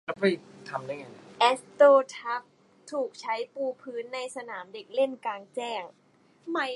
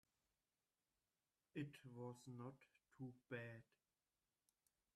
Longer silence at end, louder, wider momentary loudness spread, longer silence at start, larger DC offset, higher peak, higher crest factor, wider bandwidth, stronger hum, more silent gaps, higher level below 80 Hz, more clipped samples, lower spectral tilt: second, 0 s vs 1.35 s; first, -28 LUFS vs -57 LUFS; first, 18 LU vs 5 LU; second, 0.1 s vs 1.55 s; neither; first, -6 dBFS vs -38 dBFS; about the same, 22 dB vs 22 dB; second, 11.5 kHz vs 13 kHz; neither; neither; first, -84 dBFS vs under -90 dBFS; neither; second, -4 dB/octave vs -7 dB/octave